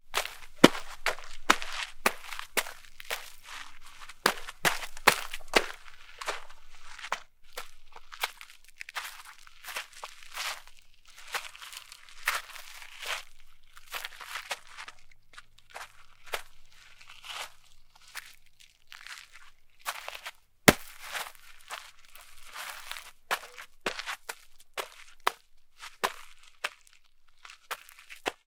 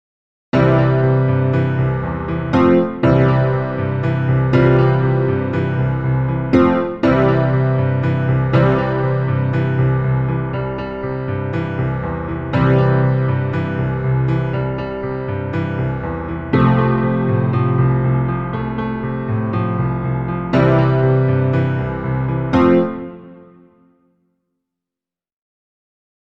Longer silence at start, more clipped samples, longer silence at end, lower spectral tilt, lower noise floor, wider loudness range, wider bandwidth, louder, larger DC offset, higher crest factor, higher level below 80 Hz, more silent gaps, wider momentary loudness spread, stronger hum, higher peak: second, 0.05 s vs 0.55 s; neither; second, 0.1 s vs 2.9 s; second, -2.5 dB/octave vs -10 dB/octave; second, -57 dBFS vs -88 dBFS; first, 14 LU vs 4 LU; first, 18 kHz vs 5.4 kHz; second, -32 LUFS vs -17 LUFS; second, under 0.1% vs 0.7%; first, 34 dB vs 16 dB; second, -52 dBFS vs -38 dBFS; neither; first, 23 LU vs 9 LU; neither; about the same, 0 dBFS vs 0 dBFS